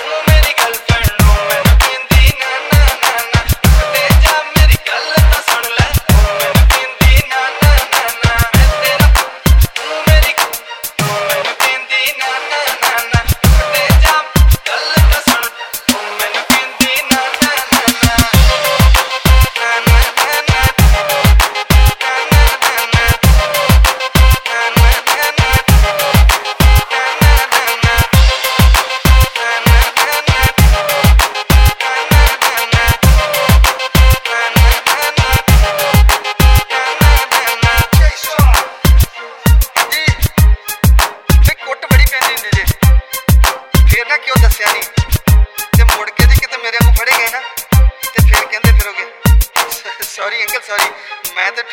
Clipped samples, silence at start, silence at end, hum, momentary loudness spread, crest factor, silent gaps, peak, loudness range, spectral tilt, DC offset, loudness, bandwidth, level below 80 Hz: 0.3%; 0 s; 0 s; none; 5 LU; 10 dB; none; 0 dBFS; 2 LU; -4 dB/octave; under 0.1%; -11 LUFS; over 20 kHz; -12 dBFS